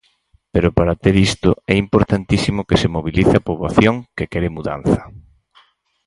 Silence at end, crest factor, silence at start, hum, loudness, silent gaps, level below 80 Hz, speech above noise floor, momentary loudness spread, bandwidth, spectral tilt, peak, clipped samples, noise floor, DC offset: 0.85 s; 16 dB; 0.55 s; none; -17 LUFS; none; -32 dBFS; 42 dB; 7 LU; 11.5 kHz; -6.5 dB/octave; 0 dBFS; under 0.1%; -58 dBFS; under 0.1%